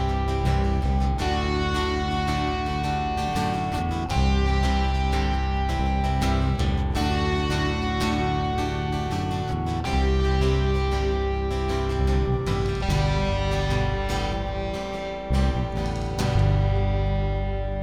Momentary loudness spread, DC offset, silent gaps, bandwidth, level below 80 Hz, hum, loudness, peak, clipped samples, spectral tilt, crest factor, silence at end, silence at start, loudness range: 5 LU; 0.4%; none; 12.5 kHz; -28 dBFS; none; -25 LUFS; -12 dBFS; under 0.1%; -6.5 dB/octave; 12 dB; 0 s; 0 s; 1 LU